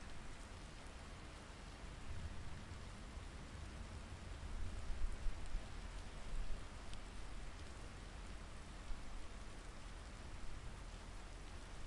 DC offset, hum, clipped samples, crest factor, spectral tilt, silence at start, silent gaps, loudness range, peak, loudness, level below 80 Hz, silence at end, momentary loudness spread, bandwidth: under 0.1%; none; under 0.1%; 20 dB; -4.5 dB/octave; 0 s; none; 3 LU; -28 dBFS; -54 LUFS; -50 dBFS; 0 s; 5 LU; 11.5 kHz